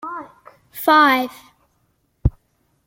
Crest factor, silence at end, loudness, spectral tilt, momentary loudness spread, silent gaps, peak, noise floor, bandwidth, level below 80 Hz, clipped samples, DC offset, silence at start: 20 dB; 0.55 s; -17 LUFS; -5.5 dB/octave; 20 LU; none; -2 dBFS; -66 dBFS; 17 kHz; -34 dBFS; under 0.1%; under 0.1%; 0.05 s